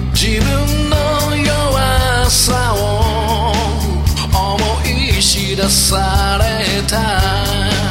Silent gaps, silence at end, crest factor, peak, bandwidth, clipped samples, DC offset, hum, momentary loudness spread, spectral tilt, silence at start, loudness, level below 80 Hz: none; 0 s; 14 dB; 0 dBFS; 16.5 kHz; under 0.1%; under 0.1%; none; 4 LU; -3.5 dB/octave; 0 s; -14 LUFS; -20 dBFS